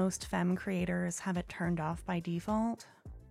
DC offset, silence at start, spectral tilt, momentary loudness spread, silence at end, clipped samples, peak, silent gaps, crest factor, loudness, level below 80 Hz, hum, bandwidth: under 0.1%; 0 s; -6 dB/octave; 5 LU; 0 s; under 0.1%; -22 dBFS; none; 14 dB; -35 LUFS; -54 dBFS; none; 14 kHz